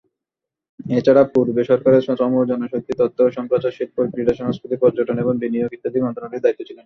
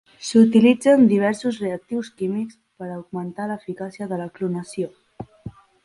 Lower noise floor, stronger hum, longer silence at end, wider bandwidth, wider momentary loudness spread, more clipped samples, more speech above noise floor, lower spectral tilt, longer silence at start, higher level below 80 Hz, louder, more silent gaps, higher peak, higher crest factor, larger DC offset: first, -85 dBFS vs -40 dBFS; neither; second, 0.1 s vs 0.35 s; second, 6.4 kHz vs 11.5 kHz; second, 9 LU vs 22 LU; neither; first, 67 dB vs 20 dB; first, -9 dB/octave vs -6.5 dB/octave; first, 0.8 s vs 0.2 s; about the same, -56 dBFS vs -60 dBFS; about the same, -19 LUFS vs -21 LUFS; neither; about the same, -2 dBFS vs -4 dBFS; about the same, 16 dB vs 18 dB; neither